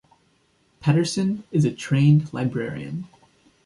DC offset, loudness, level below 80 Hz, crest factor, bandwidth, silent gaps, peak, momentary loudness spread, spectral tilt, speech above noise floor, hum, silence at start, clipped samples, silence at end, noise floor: under 0.1%; -22 LUFS; -58 dBFS; 18 dB; 11.5 kHz; none; -6 dBFS; 15 LU; -7 dB/octave; 43 dB; none; 0.8 s; under 0.1%; 0.6 s; -64 dBFS